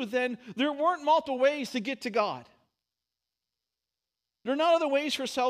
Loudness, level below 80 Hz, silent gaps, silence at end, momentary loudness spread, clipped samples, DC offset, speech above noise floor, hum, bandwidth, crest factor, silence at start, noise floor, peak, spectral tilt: -28 LUFS; -78 dBFS; none; 0 s; 9 LU; under 0.1%; under 0.1%; 61 dB; none; 15.5 kHz; 16 dB; 0 s; -89 dBFS; -14 dBFS; -3.5 dB/octave